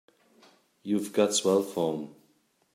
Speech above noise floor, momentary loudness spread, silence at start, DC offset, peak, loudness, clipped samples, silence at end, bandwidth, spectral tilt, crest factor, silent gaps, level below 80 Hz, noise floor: 42 dB; 17 LU; 0.85 s; under 0.1%; -10 dBFS; -27 LUFS; under 0.1%; 0.6 s; 16 kHz; -4 dB/octave; 20 dB; none; -78 dBFS; -68 dBFS